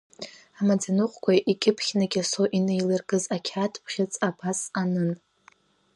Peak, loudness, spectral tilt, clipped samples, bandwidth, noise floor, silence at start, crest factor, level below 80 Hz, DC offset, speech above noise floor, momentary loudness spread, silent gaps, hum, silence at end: -8 dBFS; -26 LUFS; -5 dB/octave; under 0.1%; 11.5 kHz; -59 dBFS; 0.2 s; 18 dB; -72 dBFS; under 0.1%; 35 dB; 7 LU; none; none; 0.8 s